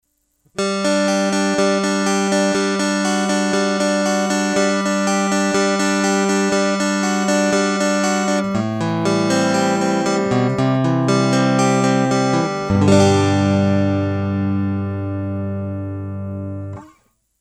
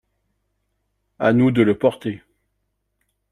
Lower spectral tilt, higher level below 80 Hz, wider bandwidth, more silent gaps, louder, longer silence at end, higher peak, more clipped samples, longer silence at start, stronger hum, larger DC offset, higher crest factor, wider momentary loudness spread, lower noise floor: second, -5 dB/octave vs -8.5 dB/octave; about the same, -54 dBFS vs -58 dBFS; first, 13.5 kHz vs 11.5 kHz; neither; about the same, -18 LUFS vs -18 LUFS; second, 0.55 s vs 1.15 s; first, 0 dBFS vs -4 dBFS; neither; second, 0.55 s vs 1.2 s; second, none vs 50 Hz at -50 dBFS; neither; about the same, 18 dB vs 20 dB; second, 9 LU vs 14 LU; second, -63 dBFS vs -73 dBFS